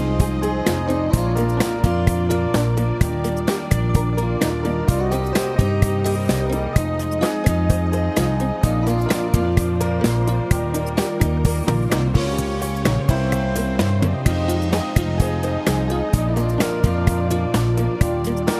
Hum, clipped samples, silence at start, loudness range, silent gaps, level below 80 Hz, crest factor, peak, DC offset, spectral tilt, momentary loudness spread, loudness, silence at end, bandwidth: none; under 0.1%; 0 s; 1 LU; none; -28 dBFS; 18 dB; 0 dBFS; under 0.1%; -6.5 dB/octave; 2 LU; -20 LUFS; 0 s; 14 kHz